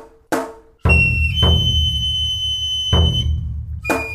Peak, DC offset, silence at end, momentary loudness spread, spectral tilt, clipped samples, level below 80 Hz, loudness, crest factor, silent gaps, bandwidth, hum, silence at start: -2 dBFS; under 0.1%; 0 s; 11 LU; -4.5 dB/octave; under 0.1%; -24 dBFS; -17 LUFS; 16 dB; none; 14.5 kHz; none; 0 s